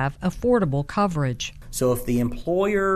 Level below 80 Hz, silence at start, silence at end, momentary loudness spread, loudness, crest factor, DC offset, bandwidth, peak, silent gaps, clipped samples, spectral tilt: -40 dBFS; 0 s; 0 s; 5 LU; -24 LUFS; 14 dB; under 0.1%; 14 kHz; -10 dBFS; none; under 0.1%; -6 dB/octave